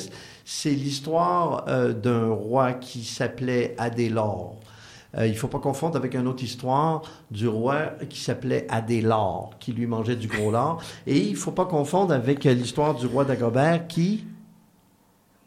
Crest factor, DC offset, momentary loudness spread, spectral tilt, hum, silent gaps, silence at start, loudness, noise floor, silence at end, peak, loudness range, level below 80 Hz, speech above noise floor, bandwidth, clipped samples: 18 dB; under 0.1%; 10 LU; -6 dB/octave; none; none; 0 s; -25 LUFS; -61 dBFS; 1.05 s; -6 dBFS; 4 LU; -58 dBFS; 36 dB; 15 kHz; under 0.1%